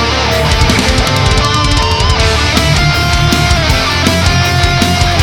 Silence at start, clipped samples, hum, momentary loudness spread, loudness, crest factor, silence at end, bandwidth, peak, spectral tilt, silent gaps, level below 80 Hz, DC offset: 0 s; under 0.1%; none; 1 LU; -10 LUFS; 10 dB; 0 s; 18.5 kHz; 0 dBFS; -4 dB/octave; none; -16 dBFS; under 0.1%